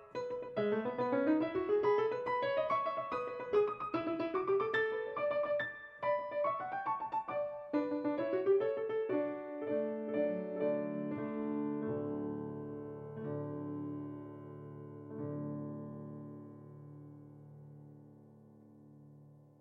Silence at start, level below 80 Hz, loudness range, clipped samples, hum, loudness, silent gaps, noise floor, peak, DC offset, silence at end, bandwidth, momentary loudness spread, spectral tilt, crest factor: 0 s; -76 dBFS; 13 LU; under 0.1%; none; -36 LUFS; none; -59 dBFS; -22 dBFS; under 0.1%; 0.2 s; 6.6 kHz; 17 LU; -8.5 dB/octave; 16 dB